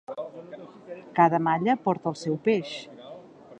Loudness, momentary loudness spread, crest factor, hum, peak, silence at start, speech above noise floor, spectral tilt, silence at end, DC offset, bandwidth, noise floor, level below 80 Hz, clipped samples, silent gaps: -25 LUFS; 22 LU; 22 dB; none; -6 dBFS; 0.1 s; 21 dB; -6.5 dB/octave; 0.05 s; under 0.1%; 9.2 kHz; -46 dBFS; -72 dBFS; under 0.1%; none